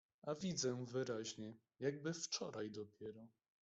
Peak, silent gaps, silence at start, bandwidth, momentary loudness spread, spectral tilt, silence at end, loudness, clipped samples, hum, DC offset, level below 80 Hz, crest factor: -28 dBFS; none; 0.25 s; 8.2 kHz; 13 LU; -4 dB/octave; 0.35 s; -45 LUFS; under 0.1%; none; under 0.1%; -82 dBFS; 18 dB